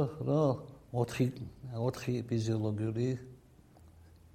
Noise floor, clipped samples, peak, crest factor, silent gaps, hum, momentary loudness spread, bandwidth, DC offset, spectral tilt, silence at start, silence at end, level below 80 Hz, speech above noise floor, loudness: -59 dBFS; under 0.1%; -16 dBFS; 18 dB; none; none; 11 LU; 14.5 kHz; under 0.1%; -7.5 dB/octave; 0 s; 0.45 s; -62 dBFS; 26 dB; -34 LUFS